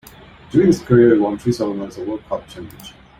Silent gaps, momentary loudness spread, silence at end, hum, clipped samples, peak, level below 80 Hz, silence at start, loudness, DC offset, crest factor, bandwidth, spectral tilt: none; 20 LU; 0.3 s; none; under 0.1%; -2 dBFS; -48 dBFS; 0.5 s; -17 LUFS; under 0.1%; 16 dB; 15 kHz; -7.5 dB/octave